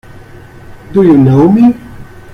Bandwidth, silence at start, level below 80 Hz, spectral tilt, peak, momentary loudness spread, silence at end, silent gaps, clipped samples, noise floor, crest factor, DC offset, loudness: 6.6 kHz; 0.7 s; -38 dBFS; -10 dB/octave; 0 dBFS; 9 LU; 0.15 s; none; under 0.1%; -32 dBFS; 10 dB; under 0.1%; -7 LUFS